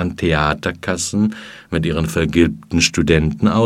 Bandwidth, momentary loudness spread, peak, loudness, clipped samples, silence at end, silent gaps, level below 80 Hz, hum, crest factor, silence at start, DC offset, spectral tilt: 15.5 kHz; 7 LU; 0 dBFS; -17 LUFS; under 0.1%; 0 s; none; -32 dBFS; none; 16 dB; 0 s; under 0.1%; -5 dB/octave